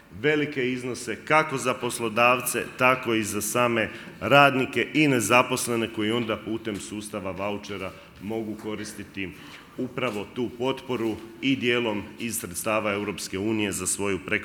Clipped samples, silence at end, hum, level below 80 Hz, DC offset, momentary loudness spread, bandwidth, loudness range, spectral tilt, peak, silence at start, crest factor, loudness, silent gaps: under 0.1%; 0 s; none; -62 dBFS; under 0.1%; 13 LU; over 20 kHz; 11 LU; -4 dB/octave; -2 dBFS; 0.1 s; 24 dB; -25 LUFS; none